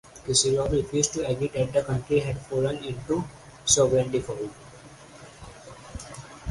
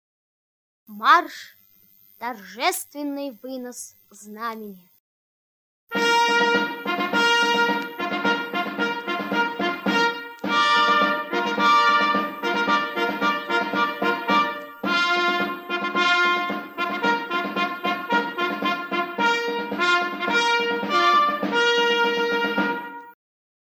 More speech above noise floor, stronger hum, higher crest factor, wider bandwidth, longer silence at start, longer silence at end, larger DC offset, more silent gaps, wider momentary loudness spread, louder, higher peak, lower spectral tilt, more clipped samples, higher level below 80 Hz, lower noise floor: second, 22 dB vs 32 dB; neither; about the same, 22 dB vs 20 dB; second, 11.5 kHz vs 19 kHz; second, 0.15 s vs 0.9 s; second, 0 s vs 0.6 s; neither; second, none vs 5.00-5.87 s; first, 24 LU vs 14 LU; second, -25 LUFS vs -21 LUFS; second, -6 dBFS vs -2 dBFS; about the same, -4 dB/octave vs -3 dB/octave; neither; first, -46 dBFS vs -80 dBFS; second, -47 dBFS vs -56 dBFS